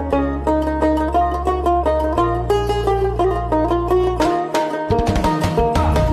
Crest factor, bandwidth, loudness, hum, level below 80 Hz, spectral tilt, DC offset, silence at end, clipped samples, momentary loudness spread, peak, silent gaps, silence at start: 10 dB; 14 kHz; -18 LUFS; none; -26 dBFS; -7 dB/octave; under 0.1%; 0 s; under 0.1%; 2 LU; -6 dBFS; none; 0 s